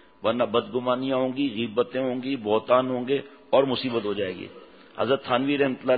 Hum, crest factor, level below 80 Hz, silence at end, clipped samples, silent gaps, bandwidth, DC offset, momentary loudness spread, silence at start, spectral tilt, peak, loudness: none; 20 dB; -66 dBFS; 0 s; under 0.1%; none; 4.9 kHz; under 0.1%; 7 LU; 0.2 s; -10 dB/octave; -6 dBFS; -25 LUFS